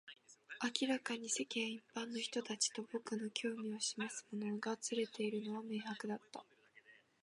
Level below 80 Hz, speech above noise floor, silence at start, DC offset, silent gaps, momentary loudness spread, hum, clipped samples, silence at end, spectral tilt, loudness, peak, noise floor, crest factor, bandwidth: under -90 dBFS; 25 dB; 0.05 s; under 0.1%; none; 8 LU; none; under 0.1%; 0.3 s; -2.5 dB/octave; -41 LUFS; -18 dBFS; -67 dBFS; 26 dB; 11.5 kHz